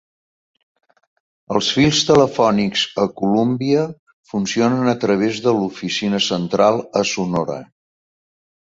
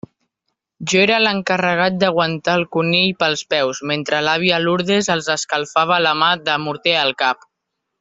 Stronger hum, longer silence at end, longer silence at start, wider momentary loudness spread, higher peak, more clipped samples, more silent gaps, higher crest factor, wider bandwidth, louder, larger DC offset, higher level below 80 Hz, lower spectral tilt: neither; first, 1.1 s vs 0.65 s; first, 1.5 s vs 0.8 s; first, 8 LU vs 5 LU; about the same, -2 dBFS vs -2 dBFS; neither; first, 3.99-4.06 s, 4.13-4.23 s vs none; about the same, 18 dB vs 16 dB; about the same, 8 kHz vs 8 kHz; about the same, -18 LUFS vs -17 LUFS; neither; first, -54 dBFS vs -60 dBFS; about the same, -4.5 dB/octave vs -3.5 dB/octave